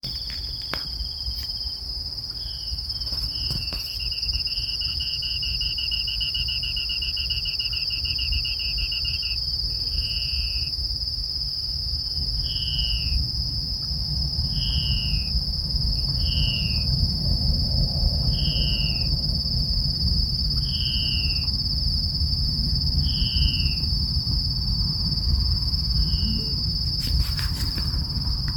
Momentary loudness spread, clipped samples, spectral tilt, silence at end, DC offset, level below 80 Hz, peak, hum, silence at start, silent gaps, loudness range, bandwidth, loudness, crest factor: 5 LU; under 0.1%; -4.5 dB/octave; 0 s; under 0.1%; -30 dBFS; -6 dBFS; none; 0.05 s; none; 3 LU; 18 kHz; -24 LUFS; 20 dB